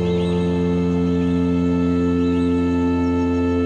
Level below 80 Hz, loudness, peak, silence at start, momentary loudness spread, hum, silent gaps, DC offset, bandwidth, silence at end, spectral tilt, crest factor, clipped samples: -38 dBFS; -19 LUFS; -10 dBFS; 0 s; 1 LU; none; none; 0.2%; 8.6 kHz; 0 s; -8.5 dB/octave; 10 dB; under 0.1%